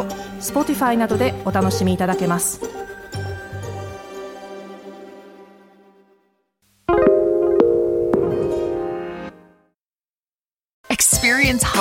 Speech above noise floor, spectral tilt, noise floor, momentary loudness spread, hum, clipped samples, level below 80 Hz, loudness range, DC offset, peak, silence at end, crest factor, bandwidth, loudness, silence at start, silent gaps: over 71 dB; -4 dB/octave; under -90 dBFS; 20 LU; none; under 0.1%; -42 dBFS; 15 LU; under 0.1%; -2 dBFS; 0 s; 20 dB; 17 kHz; -19 LUFS; 0 s; 10.74-10.84 s